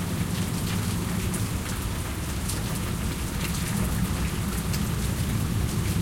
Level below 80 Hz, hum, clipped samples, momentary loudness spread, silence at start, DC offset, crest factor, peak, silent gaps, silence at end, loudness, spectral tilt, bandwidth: -34 dBFS; none; under 0.1%; 3 LU; 0 s; under 0.1%; 14 dB; -12 dBFS; none; 0 s; -28 LUFS; -5 dB/octave; 17 kHz